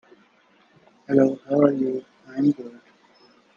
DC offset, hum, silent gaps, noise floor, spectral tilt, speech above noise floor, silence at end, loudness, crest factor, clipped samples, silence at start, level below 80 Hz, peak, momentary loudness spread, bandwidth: under 0.1%; none; none; -59 dBFS; -9 dB/octave; 38 dB; 0.85 s; -22 LUFS; 22 dB; under 0.1%; 1.1 s; -70 dBFS; -2 dBFS; 14 LU; 7 kHz